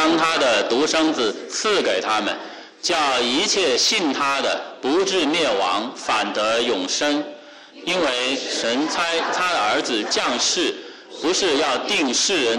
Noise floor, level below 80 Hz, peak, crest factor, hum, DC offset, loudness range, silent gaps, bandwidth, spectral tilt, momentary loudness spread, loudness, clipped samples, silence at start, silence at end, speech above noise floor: -42 dBFS; -60 dBFS; -10 dBFS; 10 dB; none; under 0.1%; 2 LU; none; 13 kHz; -1.5 dB/octave; 7 LU; -20 LUFS; under 0.1%; 0 s; 0 s; 21 dB